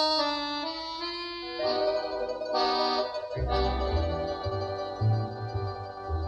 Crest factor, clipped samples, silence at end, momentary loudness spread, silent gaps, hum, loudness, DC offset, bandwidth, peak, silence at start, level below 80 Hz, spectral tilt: 14 dB; under 0.1%; 0 s; 7 LU; none; none; -30 LUFS; under 0.1%; 9.2 kHz; -14 dBFS; 0 s; -40 dBFS; -6 dB/octave